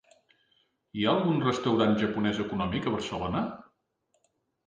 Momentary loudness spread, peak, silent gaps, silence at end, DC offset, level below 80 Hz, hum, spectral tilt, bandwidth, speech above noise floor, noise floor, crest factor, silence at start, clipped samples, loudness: 8 LU; -12 dBFS; none; 1.05 s; under 0.1%; -56 dBFS; none; -6.5 dB/octave; 9.2 kHz; 48 dB; -75 dBFS; 18 dB; 0.95 s; under 0.1%; -28 LUFS